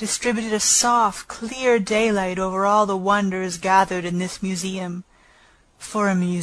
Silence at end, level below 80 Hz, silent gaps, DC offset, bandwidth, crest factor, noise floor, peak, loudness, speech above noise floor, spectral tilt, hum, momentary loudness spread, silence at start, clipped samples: 0 s; -52 dBFS; none; under 0.1%; 11 kHz; 18 dB; -55 dBFS; -4 dBFS; -20 LUFS; 34 dB; -3.5 dB/octave; none; 13 LU; 0 s; under 0.1%